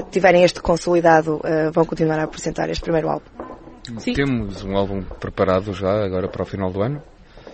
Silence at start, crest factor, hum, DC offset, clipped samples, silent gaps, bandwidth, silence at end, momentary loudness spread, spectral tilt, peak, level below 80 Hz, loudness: 0 s; 20 dB; none; under 0.1%; under 0.1%; none; 8.8 kHz; 0 s; 14 LU; -6 dB/octave; 0 dBFS; -40 dBFS; -20 LUFS